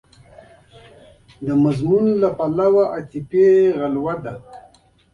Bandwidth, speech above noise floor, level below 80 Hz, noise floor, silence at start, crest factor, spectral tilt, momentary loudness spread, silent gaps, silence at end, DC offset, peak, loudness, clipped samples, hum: 7 kHz; 34 dB; -54 dBFS; -52 dBFS; 1.4 s; 14 dB; -9 dB/octave; 15 LU; none; 0.55 s; under 0.1%; -4 dBFS; -18 LUFS; under 0.1%; none